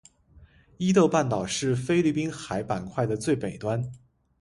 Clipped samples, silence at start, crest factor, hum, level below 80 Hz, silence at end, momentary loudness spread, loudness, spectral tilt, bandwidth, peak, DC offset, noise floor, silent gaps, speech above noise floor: under 0.1%; 0.4 s; 20 dB; none; -56 dBFS; 0.45 s; 9 LU; -26 LUFS; -6 dB/octave; 11.5 kHz; -8 dBFS; under 0.1%; -55 dBFS; none; 30 dB